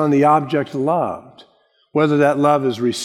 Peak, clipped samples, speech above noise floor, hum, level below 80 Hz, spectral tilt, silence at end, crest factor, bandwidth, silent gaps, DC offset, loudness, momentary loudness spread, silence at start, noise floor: -2 dBFS; under 0.1%; 42 dB; none; -66 dBFS; -6.5 dB/octave; 0 s; 16 dB; 12.5 kHz; none; under 0.1%; -17 LUFS; 9 LU; 0 s; -58 dBFS